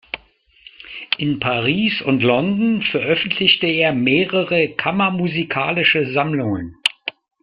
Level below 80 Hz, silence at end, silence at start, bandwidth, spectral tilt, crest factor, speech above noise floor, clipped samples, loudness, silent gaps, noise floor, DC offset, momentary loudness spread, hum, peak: -54 dBFS; 0.35 s; 0.15 s; 11 kHz; -6 dB/octave; 18 dB; 35 dB; under 0.1%; -17 LUFS; none; -53 dBFS; under 0.1%; 9 LU; none; -2 dBFS